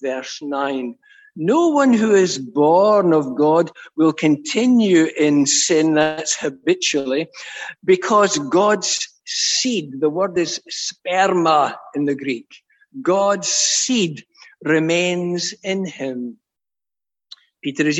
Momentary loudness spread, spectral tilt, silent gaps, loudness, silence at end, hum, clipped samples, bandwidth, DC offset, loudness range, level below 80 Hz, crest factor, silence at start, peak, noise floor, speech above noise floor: 12 LU; -3.5 dB/octave; none; -18 LUFS; 0 s; none; under 0.1%; 8.6 kHz; under 0.1%; 4 LU; -68 dBFS; 16 dB; 0 s; -4 dBFS; under -90 dBFS; over 72 dB